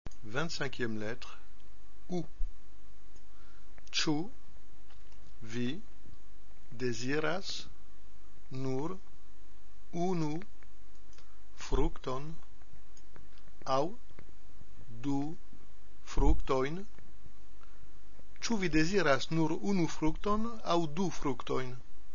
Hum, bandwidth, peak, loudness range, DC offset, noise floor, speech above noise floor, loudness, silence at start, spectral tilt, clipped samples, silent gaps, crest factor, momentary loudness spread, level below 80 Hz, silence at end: none; 7.2 kHz; -12 dBFS; 8 LU; 3%; -57 dBFS; 25 dB; -35 LUFS; 0.15 s; -4.5 dB/octave; under 0.1%; none; 24 dB; 18 LU; -44 dBFS; 0 s